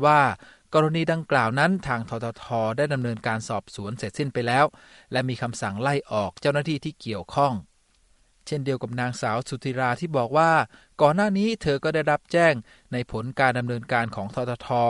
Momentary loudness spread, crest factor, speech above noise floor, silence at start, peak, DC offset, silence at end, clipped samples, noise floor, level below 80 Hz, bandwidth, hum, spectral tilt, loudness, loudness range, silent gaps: 11 LU; 20 dB; 38 dB; 0 s; -4 dBFS; under 0.1%; 0 s; under 0.1%; -62 dBFS; -56 dBFS; 11.5 kHz; none; -6 dB/octave; -25 LUFS; 5 LU; none